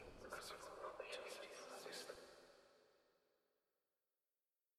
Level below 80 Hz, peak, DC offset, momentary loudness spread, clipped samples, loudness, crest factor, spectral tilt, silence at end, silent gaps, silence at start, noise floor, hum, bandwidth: -78 dBFS; -36 dBFS; under 0.1%; 11 LU; under 0.1%; -54 LUFS; 22 dB; -2 dB/octave; 1.7 s; none; 0 s; under -90 dBFS; none; 14.5 kHz